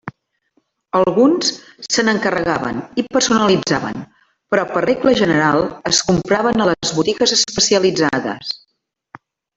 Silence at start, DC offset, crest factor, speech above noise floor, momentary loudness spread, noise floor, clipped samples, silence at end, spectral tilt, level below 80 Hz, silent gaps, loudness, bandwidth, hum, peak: 0.05 s; under 0.1%; 16 dB; 55 dB; 9 LU; -71 dBFS; under 0.1%; 1 s; -3.5 dB/octave; -50 dBFS; none; -16 LUFS; 8.2 kHz; none; 0 dBFS